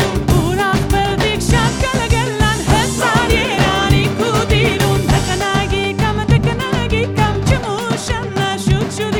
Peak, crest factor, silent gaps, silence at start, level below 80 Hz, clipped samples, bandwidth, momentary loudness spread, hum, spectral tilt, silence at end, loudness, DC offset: 0 dBFS; 14 dB; none; 0 s; -24 dBFS; under 0.1%; 18 kHz; 4 LU; none; -5 dB/octave; 0 s; -15 LUFS; under 0.1%